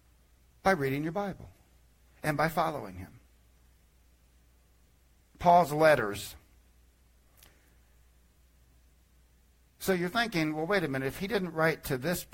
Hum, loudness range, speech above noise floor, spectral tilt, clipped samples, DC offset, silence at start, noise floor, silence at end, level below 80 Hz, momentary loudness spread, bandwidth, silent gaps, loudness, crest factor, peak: none; 7 LU; 35 dB; -5.5 dB/octave; under 0.1%; under 0.1%; 0.65 s; -64 dBFS; 0.1 s; -58 dBFS; 16 LU; 16.5 kHz; none; -29 LUFS; 22 dB; -12 dBFS